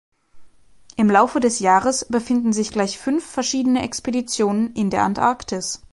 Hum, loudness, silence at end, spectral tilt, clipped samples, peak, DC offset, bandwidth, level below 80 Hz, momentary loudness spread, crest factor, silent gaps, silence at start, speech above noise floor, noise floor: none; -20 LUFS; 0.15 s; -4 dB/octave; under 0.1%; -2 dBFS; under 0.1%; 11.5 kHz; -52 dBFS; 8 LU; 18 dB; none; 0.35 s; 31 dB; -50 dBFS